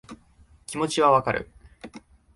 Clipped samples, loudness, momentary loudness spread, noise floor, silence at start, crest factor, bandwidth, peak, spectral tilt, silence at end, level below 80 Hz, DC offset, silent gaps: under 0.1%; -23 LUFS; 25 LU; -56 dBFS; 0.1 s; 22 dB; 11.5 kHz; -6 dBFS; -4.5 dB/octave; 0.4 s; -54 dBFS; under 0.1%; none